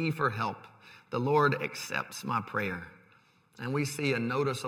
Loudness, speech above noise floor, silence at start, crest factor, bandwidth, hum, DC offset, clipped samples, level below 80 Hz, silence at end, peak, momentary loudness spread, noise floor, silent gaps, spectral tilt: -31 LUFS; 32 dB; 0 s; 18 dB; 17 kHz; none; under 0.1%; under 0.1%; -72 dBFS; 0 s; -14 dBFS; 15 LU; -63 dBFS; none; -5.5 dB/octave